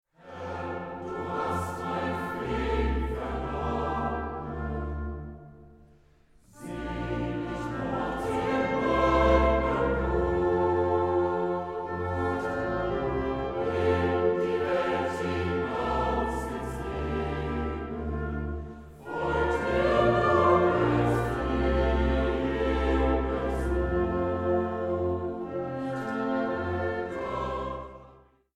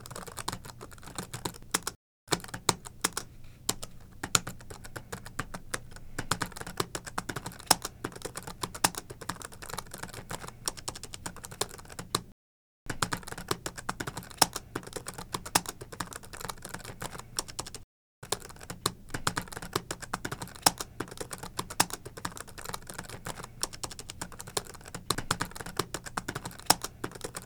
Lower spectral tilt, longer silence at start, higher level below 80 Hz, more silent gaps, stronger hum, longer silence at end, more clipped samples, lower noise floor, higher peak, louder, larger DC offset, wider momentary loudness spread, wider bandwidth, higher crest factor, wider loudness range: first, -7.5 dB/octave vs -2 dB/octave; first, 0.25 s vs 0 s; first, -38 dBFS vs -52 dBFS; second, none vs 1.96-2.27 s, 12.32-12.86 s, 17.84-18.22 s; neither; first, 0.45 s vs 0 s; neither; second, -59 dBFS vs under -90 dBFS; second, -8 dBFS vs 0 dBFS; first, -28 LUFS vs -34 LUFS; neither; second, 11 LU vs 15 LU; second, 12.5 kHz vs over 20 kHz; second, 20 dB vs 36 dB; first, 8 LU vs 5 LU